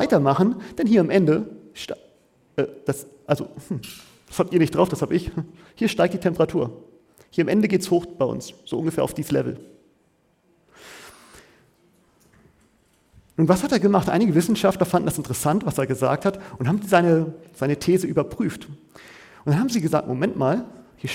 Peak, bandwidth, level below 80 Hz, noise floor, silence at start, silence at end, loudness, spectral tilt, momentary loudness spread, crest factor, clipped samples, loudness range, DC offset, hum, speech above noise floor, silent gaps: -2 dBFS; 17 kHz; -52 dBFS; -64 dBFS; 0 s; 0 s; -22 LUFS; -6.5 dB/octave; 16 LU; 20 dB; under 0.1%; 8 LU; under 0.1%; none; 42 dB; none